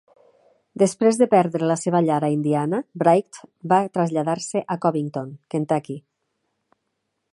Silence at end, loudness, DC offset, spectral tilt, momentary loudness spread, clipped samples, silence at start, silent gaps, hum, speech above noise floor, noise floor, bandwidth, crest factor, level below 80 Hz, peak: 1.35 s; -21 LUFS; under 0.1%; -6.5 dB/octave; 13 LU; under 0.1%; 0.75 s; none; none; 55 dB; -76 dBFS; 11.5 kHz; 20 dB; -72 dBFS; -2 dBFS